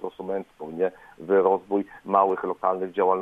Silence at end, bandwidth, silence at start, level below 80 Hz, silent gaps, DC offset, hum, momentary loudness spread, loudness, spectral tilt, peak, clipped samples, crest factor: 0 s; 3.8 kHz; 0 s; -68 dBFS; none; under 0.1%; none; 11 LU; -25 LUFS; -8.5 dB/octave; -6 dBFS; under 0.1%; 18 dB